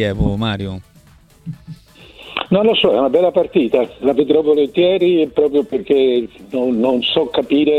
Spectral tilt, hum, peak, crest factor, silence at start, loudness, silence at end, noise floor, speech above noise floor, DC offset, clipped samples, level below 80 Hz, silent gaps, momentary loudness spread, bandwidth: -7.5 dB/octave; none; -2 dBFS; 14 dB; 0 s; -15 LUFS; 0 s; -47 dBFS; 32 dB; under 0.1%; under 0.1%; -38 dBFS; none; 14 LU; 9.2 kHz